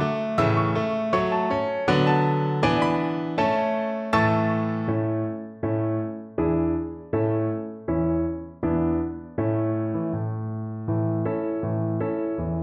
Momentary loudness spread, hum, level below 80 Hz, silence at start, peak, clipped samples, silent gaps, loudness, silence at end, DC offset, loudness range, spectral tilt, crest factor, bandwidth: 8 LU; none; -46 dBFS; 0 s; -8 dBFS; under 0.1%; none; -25 LUFS; 0 s; under 0.1%; 4 LU; -8 dB/octave; 16 dB; 9 kHz